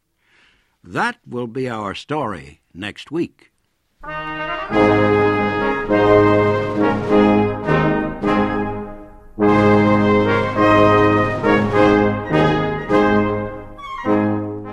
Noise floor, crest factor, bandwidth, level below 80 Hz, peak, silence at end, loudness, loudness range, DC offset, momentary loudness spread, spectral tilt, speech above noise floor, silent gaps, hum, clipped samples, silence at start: -57 dBFS; 16 dB; 9.6 kHz; -40 dBFS; 0 dBFS; 0 s; -17 LUFS; 11 LU; under 0.1%; 15 LU; -7.5 dB/octave; 38 dB; none; none; under 0.1%; 0.85 s